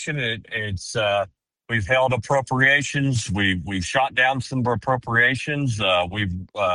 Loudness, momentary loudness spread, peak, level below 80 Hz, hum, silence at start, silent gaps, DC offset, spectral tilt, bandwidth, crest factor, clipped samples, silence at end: -21 LUFS; 9 LU; -4 dBFS; -48 dBFS; none; 0 s; none; under 0.1%; -4.5 dB/octave; 11.5 kHz; 18 dB; under 0.1%; 0 s